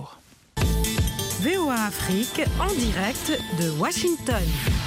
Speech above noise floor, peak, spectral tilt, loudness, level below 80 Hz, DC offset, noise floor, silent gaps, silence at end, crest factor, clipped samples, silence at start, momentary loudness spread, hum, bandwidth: 26 dB; -10 dBFS; -4.5 dB/octave; -24 LUFS; -32 dBFS; under 0.1%; -50 dBFS; none; 0 s; 14 dB; under 0.1%; 0 s; 3 LU; none; 16 kHz